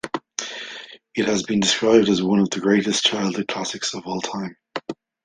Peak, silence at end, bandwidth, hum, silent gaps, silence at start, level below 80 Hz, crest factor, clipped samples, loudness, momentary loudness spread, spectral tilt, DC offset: -2 dBFS; 0.3 s; 10 kHz; none; none; 0.05 s; -60 dBFS; 20 dB; under 0.1%; -21 LUFS; 16 LU; -4 dB/octave; under 0.1%